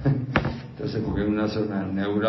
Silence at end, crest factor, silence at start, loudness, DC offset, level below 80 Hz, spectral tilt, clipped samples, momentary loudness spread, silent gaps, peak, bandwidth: 0 s; 20 dB; 0 s; -26 LUFS; under 0.1%; -42 dBFS; -8.5 dB/octave; under 0.1%; 7 LU; none; -4 dBFS; 6 kHz